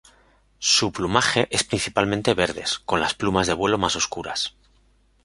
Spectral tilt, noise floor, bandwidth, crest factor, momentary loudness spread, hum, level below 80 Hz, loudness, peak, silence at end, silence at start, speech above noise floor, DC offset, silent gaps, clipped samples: -3 dB/octave; -60 dBFS; 11.5 kHz; 22 dB; 7 LU; none; -48 dBFS; -22 LUFS; -2 dBFS; 0.75 s; 0.6 s; 37 dB; under 0.1%; none; under 0.1%